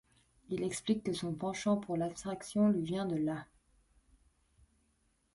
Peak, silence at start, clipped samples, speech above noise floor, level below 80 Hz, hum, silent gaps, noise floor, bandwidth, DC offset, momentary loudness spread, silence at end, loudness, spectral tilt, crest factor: -20 dBFS; 0.5 s; under 0.1%; 41 dB; -66 dBFS; none; none; -75 dBFS; 11.5 kHz; under 0.1%; 8 LU; 1.9 s; -35 LUFS; -6 dB/octave; 18 dB